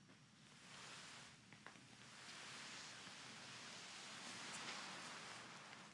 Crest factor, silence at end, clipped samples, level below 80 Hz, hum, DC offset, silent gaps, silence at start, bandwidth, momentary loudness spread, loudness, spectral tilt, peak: 20 dB; 0 s; under 0.1%; under -90 dBFS; none; under 0.1%; none; 0 s; 12 kHz; 11 LU; -54 LUFS; -1.5 dB/octave; -36 dBFS